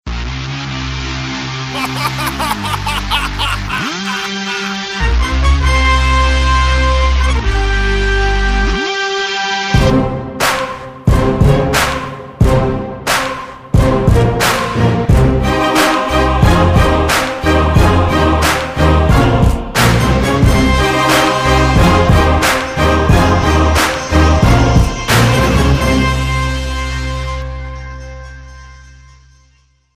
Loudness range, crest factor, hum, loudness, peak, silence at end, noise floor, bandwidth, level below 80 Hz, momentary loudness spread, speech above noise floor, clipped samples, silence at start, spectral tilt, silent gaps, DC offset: 6 LU; 12 dB; none; -13 LUFS; 0 dBFS; 1.2 s; -53 dBFS; 16 kHz; -18 dBFS; 9 LU; 35 dB; under 0.1%; 0.05 s; -5 dB/octave; none; under 0.1%